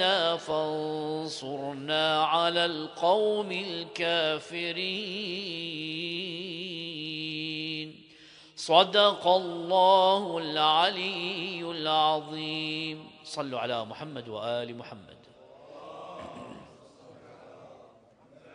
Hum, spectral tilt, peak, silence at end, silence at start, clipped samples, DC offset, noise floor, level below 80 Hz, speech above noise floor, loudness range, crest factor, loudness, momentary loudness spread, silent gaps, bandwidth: none; -4 dB/octave; -4 dBFS; 0 s; 0 s; under 0.1%; under 0.1%; -58 dBFS; -74 dBFS; 30 dB; 16 LU; 24 dB; -28 LUFS; 18 LU; none; 10.5 kHz